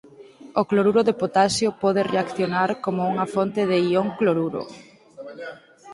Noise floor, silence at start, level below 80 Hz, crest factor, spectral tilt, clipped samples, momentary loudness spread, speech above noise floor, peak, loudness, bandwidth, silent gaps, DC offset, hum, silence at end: -45 dBFS; 0.05 s; -62 dBFS; 18 dB; -5.5 dB/octave; under 0.1%; 17 LU; 24 dB; -4 dBFS; -22 LUFS; 11.5 kHz; none; under 0.1%; none; 0 s